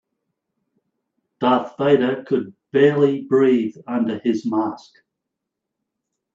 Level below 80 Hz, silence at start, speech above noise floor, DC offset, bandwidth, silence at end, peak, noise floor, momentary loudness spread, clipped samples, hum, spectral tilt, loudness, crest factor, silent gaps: -68 dBFS; 1.4 s; 63 dB; under 0.1%; 7.4 kHz; 1.55 s; -2 dBFS; -82 dBFS; 8 LU; under 0.1%; none; -7.5 dB/octave; -19 LUFS; 20 dB; none